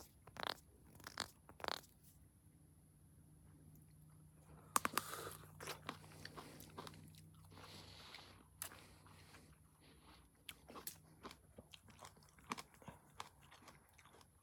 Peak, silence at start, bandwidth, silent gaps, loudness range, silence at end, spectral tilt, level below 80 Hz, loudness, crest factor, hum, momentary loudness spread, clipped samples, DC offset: -14 dBFS; 0 s; 19 kHz; none; 10 LU; 0 s; -2 dB/octave; -74 dBFS; -50 LUFS; 40 dB; none; 19 LU; under 0.1%; under 0.1%